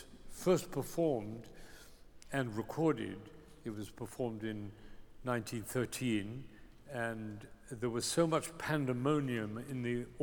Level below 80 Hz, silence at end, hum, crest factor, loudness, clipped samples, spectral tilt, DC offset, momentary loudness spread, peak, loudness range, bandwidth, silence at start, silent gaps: -60 dBFS; 0 s; none; 20 dB; -37 LUFS; under 0.1%; -5.5 dB/octave; under 0.1%; 17 LU; -16 dBFS; 4 LU; over 20 kHz; 0 s; none